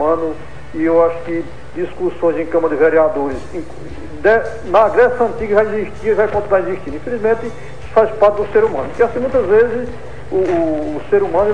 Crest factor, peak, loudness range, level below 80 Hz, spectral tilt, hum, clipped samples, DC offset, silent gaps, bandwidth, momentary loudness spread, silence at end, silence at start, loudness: 14 dB; 0 dBFS; 2 LU; -38 dBFS; -7.5 dB/octave; none; under 0.1%; 4%; none; 10 kHz; 16 LU; 0 s; 0 s; -16 LUFS